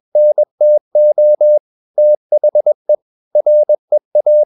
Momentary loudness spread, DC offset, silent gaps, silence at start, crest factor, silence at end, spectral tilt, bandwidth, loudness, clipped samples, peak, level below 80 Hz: 6 LU; under 0.1%; 0.51-0.58 s, 0.81-0.91 s, 1.60-1.94 s, 2.17-2.30 s, 2.75-2.85 s, 3.02-3.31 s, 3.79-3.88 s, 4.05-4.11 s; 0.15 s; 6 dB; 0 s; -10.5 dB/octave; 0.9 kHz; -12 LUFS; under 0.1%; -4 dBFS; -82 dBFS